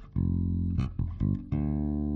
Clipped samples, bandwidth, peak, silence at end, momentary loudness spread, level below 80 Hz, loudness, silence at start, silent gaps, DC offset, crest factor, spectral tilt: under 0.1%; 4.5 kHz; -16 dBFS; 0 s; 2 LU; -36 dBFS; -31 LUFS; 0 s; none; under 0.1%; 14 dB; -11 dB/octave